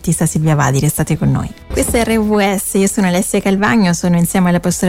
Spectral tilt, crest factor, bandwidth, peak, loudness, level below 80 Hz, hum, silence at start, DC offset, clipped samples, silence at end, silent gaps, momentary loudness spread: -5.5 dB/octave; 12 dB; 16.5 kHz; -2 dBFS; -14 LUFS; -32 dBFS; none; 0 s; under 0.1%; under 0.1%; 0 s; none; 3 LU